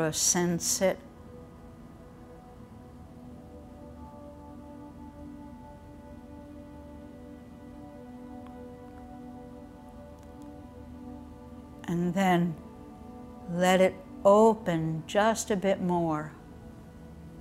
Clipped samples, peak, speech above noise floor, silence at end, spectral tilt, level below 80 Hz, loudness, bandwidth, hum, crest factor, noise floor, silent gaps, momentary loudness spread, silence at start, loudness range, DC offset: under 0.1%; -10 dBFS; 23 dB; 0 s; -4.5 dB/octave; -54 dBFS; -26 LUFS; 16 kHz; none; 22 dB; -49 dBFS; none; 24 LU; 0 s; 21 LU; under 0.1%